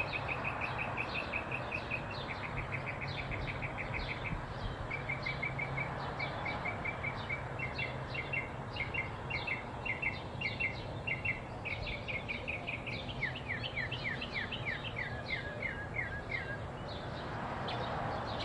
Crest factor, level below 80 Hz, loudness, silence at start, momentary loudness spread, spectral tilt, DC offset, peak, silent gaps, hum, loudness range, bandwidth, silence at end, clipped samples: 16 dB; -52 dBFS; -38 LUFS; 0 s; 4 LU; -6 dB/octave; under 0.1%; -22 dBFS; none; none; 2 LU; 11.5 kHz; 0 s; under 0.1%